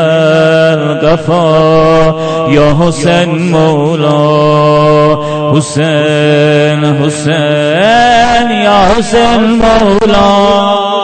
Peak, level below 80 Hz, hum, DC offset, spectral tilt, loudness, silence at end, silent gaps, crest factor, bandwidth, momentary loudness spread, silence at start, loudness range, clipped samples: 0 dBFS; -28 dBFS; none; under 0.1%; -6 dB/octave; -8 LUFS; 0 s; none; 8 dB; 9.2 kHz; 4 LU; 0 s; 1 LU; 0.2%